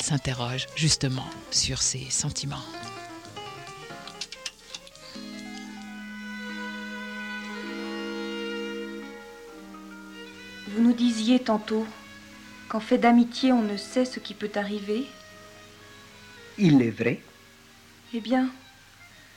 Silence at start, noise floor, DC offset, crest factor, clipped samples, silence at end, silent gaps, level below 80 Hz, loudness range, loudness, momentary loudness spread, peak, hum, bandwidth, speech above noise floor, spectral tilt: 0 s; -52 dBFS; under 0.1%; 20 dB; under 0.1%; 0.1 s; none; -56 dBFS; 13 LU; -27 LUFS; 22 LU; -10 dBFS; none; 16 kHz; 28 dB; -4 dB/octave